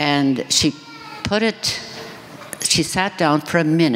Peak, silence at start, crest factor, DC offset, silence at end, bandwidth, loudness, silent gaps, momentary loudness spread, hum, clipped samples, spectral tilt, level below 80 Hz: -2 dBFS; 0 s; 18 dB; under 0.1%; 0 s; 16 kHz; -19 LUFS; none; 18 LU; none; under 0.1%; -3.5 dB/octave; -50 dBFS